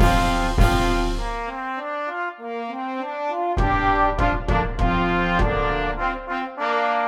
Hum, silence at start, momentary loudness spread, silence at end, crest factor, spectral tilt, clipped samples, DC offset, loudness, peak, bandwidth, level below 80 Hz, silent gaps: none; 0 s; 9 LU; 0 s; 18 dB; -6 dB/octave; under 0.1%; under 0.1%; -23 LUFS; -4 dBFS; 15 kHz; -26 dBFS; none